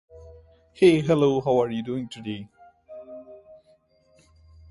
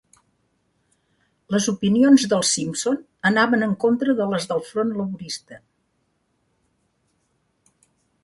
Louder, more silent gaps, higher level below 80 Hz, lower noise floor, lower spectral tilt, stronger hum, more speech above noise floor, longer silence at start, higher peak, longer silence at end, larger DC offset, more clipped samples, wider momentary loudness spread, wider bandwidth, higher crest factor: second, -23 LUFS vs -20 LUFS; neither; first, -58 dBFS vs -64 dBFS; second, -61 dBFS vs -70 dBFS; first, -7 dB/octave vs -4 dB/octave; neither; second, 39 dB vs 49 dB; second, 0.15 s vs 1.5 s; about the same, -6 dBFS vs -4 dBFS; second, 1.35 s vs 2.65 s; neither; neither; first, 24 LU vs 13 LU; about the same, 11.5 kHz vs 11.5 kHz; about the same, 20 dB vs 20 dB